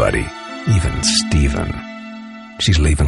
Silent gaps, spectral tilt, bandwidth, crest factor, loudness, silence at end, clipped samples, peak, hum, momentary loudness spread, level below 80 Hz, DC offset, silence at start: none; -4.5 dB/octave; 11.5 kHz; 16 dB; -17 LUFS; 0 s; under 0.1%; -2 dBFS; none; 17 LU; -22 dBFS; under 0.1%; 0 s